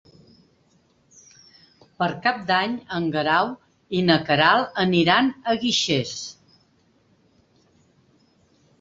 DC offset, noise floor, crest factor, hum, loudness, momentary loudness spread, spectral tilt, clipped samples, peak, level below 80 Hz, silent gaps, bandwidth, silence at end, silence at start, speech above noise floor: under 0.1%; -62 dBFS; 22 dB; none; -21 LUFS; 11 LU; -4.5 dB/octave; under 0.1%; -4 dBFS; -60 dBFS; none; 8 kHz; 2.5 s; 2 s; 41 dB